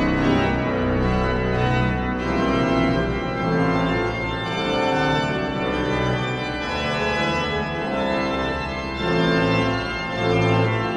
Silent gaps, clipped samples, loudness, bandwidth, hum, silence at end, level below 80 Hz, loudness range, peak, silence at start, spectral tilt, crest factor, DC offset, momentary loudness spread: none; under 0.1%; -22 LUFS; 11 kHz; none; 0 s; -34 dBFS; 2 LU; -6 dBFS; 0 s; -6.5 dB/octave; 16 dB; under 0.1%; 5 LU